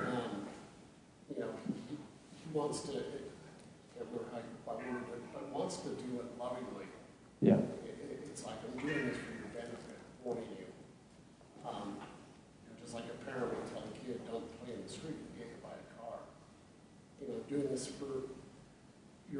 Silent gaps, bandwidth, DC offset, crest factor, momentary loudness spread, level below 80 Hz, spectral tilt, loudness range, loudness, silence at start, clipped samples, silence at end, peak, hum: none; 11 kHz; under 0.1%; 28 dB; 20 LU; -72 dBFS; -6 dB/octave; 10 LU; -42 LUFS; 0 s; under 0.1%; 0 s; -16 dBFS; none